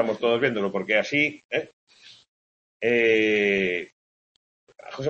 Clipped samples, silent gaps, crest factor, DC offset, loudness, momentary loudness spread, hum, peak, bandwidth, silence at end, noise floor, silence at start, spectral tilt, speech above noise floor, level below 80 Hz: under 0.1%; 1.44-1.49 s, 1.73-1.87 s, 2.28-2.80 s, 3.92-4.67 s; 18 dB; under 0.1%; -23 LUFS; 11 LU; none; -6 dBFS; 8 kHz; 0 s; under -90 dBFS; 0 s; -5 dB/octave; over 66 dB; -66 dBFS